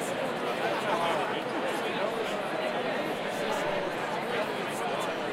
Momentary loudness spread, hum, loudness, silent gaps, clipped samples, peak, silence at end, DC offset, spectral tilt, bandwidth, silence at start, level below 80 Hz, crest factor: 3 LU; none; -30 LUFS; none; under 0.1%; -16 dBFS; 0 s; under 0.1%; -4 dB/octave; 16 kHz; 0 s; -66 dBFS; 16 dB